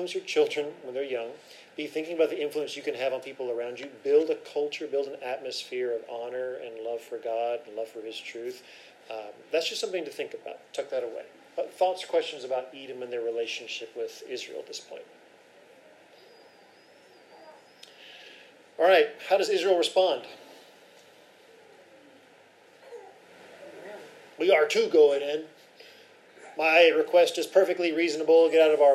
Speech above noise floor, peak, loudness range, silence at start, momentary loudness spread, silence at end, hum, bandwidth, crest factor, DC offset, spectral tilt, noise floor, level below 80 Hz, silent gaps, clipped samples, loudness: 30 dB; -6 dBFS; 13 LU; 0 s; 24 LU; 0 s; none; 14 kHz; 22 dB; under 0.1%; -2.5 dB/octave; -56 dBFS; under -90 dBFS; none; under 0.1%; -27 LUFS